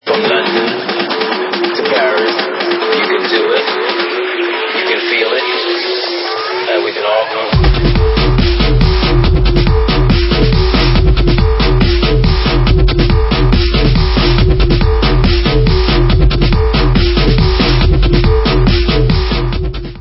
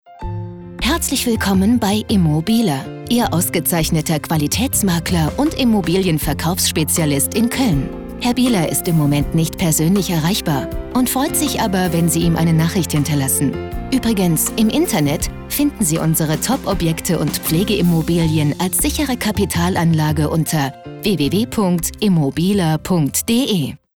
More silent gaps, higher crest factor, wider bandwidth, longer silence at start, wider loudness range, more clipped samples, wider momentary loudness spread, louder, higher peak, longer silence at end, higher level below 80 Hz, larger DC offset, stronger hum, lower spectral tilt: neither; about the same, 10 dB vs 10 dB; second, 5.8 kHz vs over 20 kHz; about the same, 0.05 s vs 0.1 s; about the same, 2 LU vs 1 LU; neither; about the same, 4 LU vs 5 LU; first, -12 LUFS vs -17 LUFS; first, 0 dBFS vs -6 dBFS; second, 0 s vs 0.2 s; first, -14 dBFS vs -34 dBFS; neither; neither; first, -9 dB/octave vs -5 dB/octave